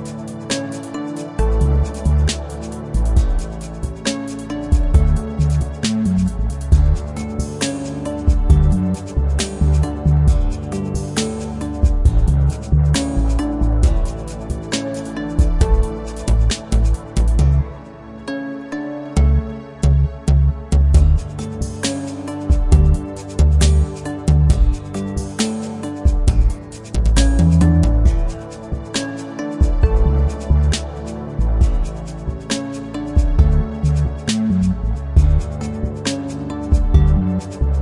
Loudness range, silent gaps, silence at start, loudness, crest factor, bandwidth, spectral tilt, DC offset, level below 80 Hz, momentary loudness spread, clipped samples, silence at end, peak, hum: 3 LU; none; 0 s; -19 LUFS; 16 dB; 11.5 kHz; -6.5 dB/octave; under 0.1%; -18 dBFS; 12 LU; under 0.1%; 0 s; 0 dBFS; none